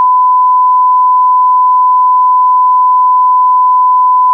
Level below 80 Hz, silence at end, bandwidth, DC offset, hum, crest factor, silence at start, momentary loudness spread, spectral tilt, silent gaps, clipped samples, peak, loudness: under -90 dBFS; 0 s; 1.2 kHz; under 0.1%; none; 4 dB; 0 s; 0 LU; -3.5 dB/octave; none; under 0.1%; -4 dBFS; -7 LUFS